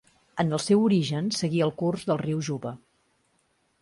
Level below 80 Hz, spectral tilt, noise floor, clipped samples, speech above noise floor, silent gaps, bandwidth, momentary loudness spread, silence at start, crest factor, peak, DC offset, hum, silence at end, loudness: -64 dBFS; -6 dB/octave; -70 dBFS; under 0.1%; 45 dB; none; 11.5 kHz; 14 LU; 0.35 s; 16 dB; -10 dBFS; under 0.1%; none; 1.05 s; -26 LUFS